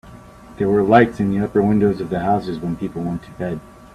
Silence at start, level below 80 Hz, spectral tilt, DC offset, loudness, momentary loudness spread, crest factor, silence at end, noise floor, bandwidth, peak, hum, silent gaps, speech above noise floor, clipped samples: 0.05 s; -46 dBFS; -8.5 dB/octave; under 0.1%; -19 LUFS; 13 LU; 18 dB; 0.1 s; -41 dBFS; 11.5 kHz; 0 dBFS; none; none; 23 dB; under 0.1%